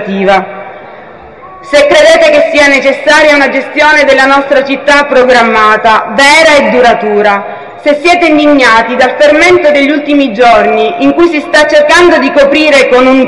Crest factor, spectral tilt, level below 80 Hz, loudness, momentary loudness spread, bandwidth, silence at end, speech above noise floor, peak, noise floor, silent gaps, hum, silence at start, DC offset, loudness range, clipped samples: 6 dB; -3.5 dB/octave; -38 dBFS; -5 LUFS; 6 LU; 12 kHz; 0 s; 24 dB; 0 dBFS; -29 dBFS; none; none; 0 s; 1%; 1 LU; 5%